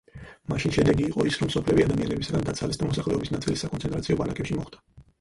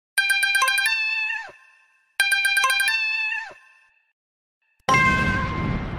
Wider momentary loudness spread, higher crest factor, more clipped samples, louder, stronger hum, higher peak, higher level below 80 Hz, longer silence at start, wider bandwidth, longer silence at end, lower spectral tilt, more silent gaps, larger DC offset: second, 9 LU vs 12 LU; about the same, 18 dB vs 20 dB; neither; second, -26 LUFS vs -20 LUFS; neither; second, -8 dBFS vs -2 dBFS; about the same, -44 dBFS vs -40 dBFS; about the same, 0.15 s vs 0.15 s; second, 11.5 kHz vs 16 kHz; first, 0.2 s vs 0 s; first, -6 dB/octave vs -2.5 dB/octave; second, none vs 4.13-4.61 s; second, under 0.1% vs 0.1%